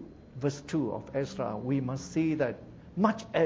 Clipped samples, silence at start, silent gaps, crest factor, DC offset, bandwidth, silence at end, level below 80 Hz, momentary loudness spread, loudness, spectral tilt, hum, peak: under 0.1%; 0 s; none; 20 dB; under 0.1%; 8 kHz; 0 s; -58 dBFS; 6 LU; -32 LUFS; -7 dB/octave; none; -10 dBFS